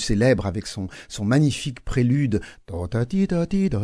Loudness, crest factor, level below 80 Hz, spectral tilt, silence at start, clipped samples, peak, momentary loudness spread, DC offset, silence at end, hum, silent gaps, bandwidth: -23 LUFS; 16 dB; -38 dBFS; -6.5 dB/octave; 0 s; under 0.1%; -6 dBFS; 12 LU; under 0.1%; 0 s; none; none; 11 kHz